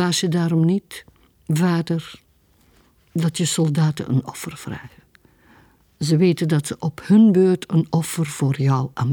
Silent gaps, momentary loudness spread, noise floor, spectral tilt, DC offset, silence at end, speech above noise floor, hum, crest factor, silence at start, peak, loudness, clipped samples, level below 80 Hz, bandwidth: none; 16 LU; -58 dBFS; -6 dB/octave; under 0.1%; 0 s; 39 dB; none; 16 dB; 0 s; -4 dBFS; -20 LUFS; under 0.1%; -58 dBFS; 18.5 kHz